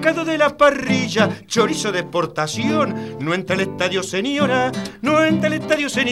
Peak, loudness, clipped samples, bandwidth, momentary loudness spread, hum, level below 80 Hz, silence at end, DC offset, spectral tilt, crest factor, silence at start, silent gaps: -4 dBFS; -19 LUFS; under 0.1%; 15 kHz; 7 LU; none; -54 dBFS; 0 s; 0.1%; -4.5 dB/octave; 16 dB; 0 s; none